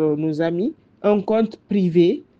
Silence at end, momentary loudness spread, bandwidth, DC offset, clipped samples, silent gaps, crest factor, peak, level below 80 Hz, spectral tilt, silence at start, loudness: 0.2 s; 7 LU; 6.6 kHz; under 0.1%; under 0.1%; none; 14 dB; -4 dBFS; -62 dBFS; -9 dB/octave; 0 s; -20 LUFS